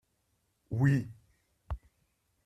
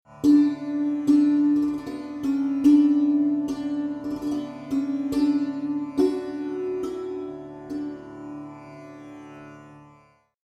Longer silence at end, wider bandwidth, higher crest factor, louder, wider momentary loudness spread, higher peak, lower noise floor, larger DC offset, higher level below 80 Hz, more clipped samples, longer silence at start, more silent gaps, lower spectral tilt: about the same, 0.7 s vs 0.7 s; about the same, 8.6 kHz vs 8.4 kHz; about the same, 20 dB vs 16 dB; second, -30 LUFS vs -24 LUFS; second, 16 LU vs 23 LU; second, -16 dBFS vs -8 dBFS; first, -77 dBFS vs -58 dBFS; neither; first, -52 dBFS vs -60 dBFS; neither; first, 0.7 s vs 0.1 s; neither; first, -8.5 dB/octave vs -7 dB/octave